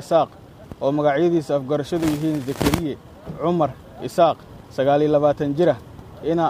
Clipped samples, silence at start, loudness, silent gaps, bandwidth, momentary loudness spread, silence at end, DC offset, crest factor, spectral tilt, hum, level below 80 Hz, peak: under 0.1%; 0 s; -21 LUFS; none; 15.5 kHz; 14 LU; 0 s; under 0.1%; 18 dB; -6.5 dB/octave; none; -44 dBFS; -4 dBFS